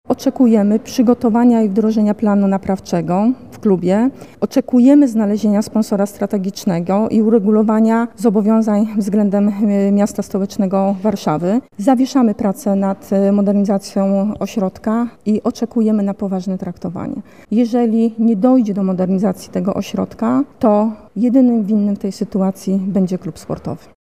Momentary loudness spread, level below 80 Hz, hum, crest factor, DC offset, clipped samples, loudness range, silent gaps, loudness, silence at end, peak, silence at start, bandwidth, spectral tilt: 8 LU; -52 dBFS; none; 14 dB; 0.4%; under 0.1%; 3 LU; none; -16 LUFS; 0.35 s; 0 dBFS; 0.1 s; 14.5 kHz; -7.5 dB/octave